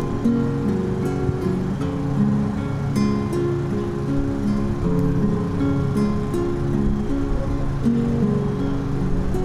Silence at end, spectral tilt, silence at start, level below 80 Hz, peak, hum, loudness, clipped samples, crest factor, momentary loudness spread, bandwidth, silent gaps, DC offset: 0 s; -8.5 dB/octave; 0 s; -30 dBFS; -8 dBFS; none; -22 LUFS; under 0.1%; 12 dB; 4 LU; 12.5 kHz; none; under 0.1%